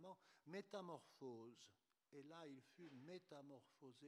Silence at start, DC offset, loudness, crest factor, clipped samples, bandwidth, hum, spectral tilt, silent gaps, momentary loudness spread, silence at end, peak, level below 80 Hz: 0 s; under 0.1%; -60 LUFS; 20 dB; under 0.1%; 13 kHz; none; -5.5 dB/octave; none; 11 LU; 0 s; -40 dBFS; under -90 dBFS